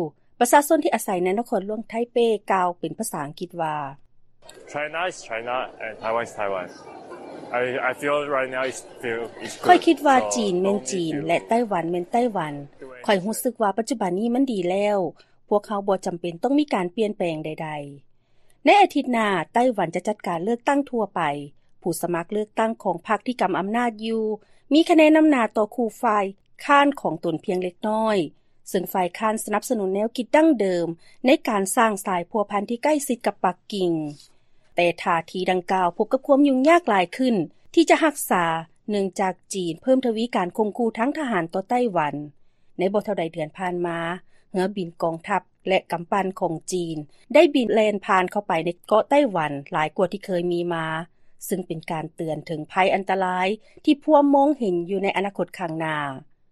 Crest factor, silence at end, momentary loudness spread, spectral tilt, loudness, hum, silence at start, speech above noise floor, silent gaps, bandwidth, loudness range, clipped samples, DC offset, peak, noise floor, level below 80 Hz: 20 dB; 0.3 s; 12 LU; -5 dB/octave; -23 LUFS; none; 0 s; 33 dB; none; 13 kHz; 6 LU; under 0.1%; under 0.1%; -4 dBFS; -55 dBFS; -62 dBFS